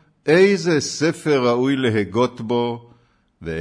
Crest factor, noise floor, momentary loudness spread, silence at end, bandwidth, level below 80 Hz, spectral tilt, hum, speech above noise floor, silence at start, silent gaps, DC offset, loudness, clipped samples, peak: 16 dB; -56 dBFS; 12 LU; 0 s; 11 kHz; -54 dBFS; -5.5 dB/octave; none; 38 dB; 0.25 s; none; under 0.1%; -19 LUFS; under 0.1%; -4 dBFS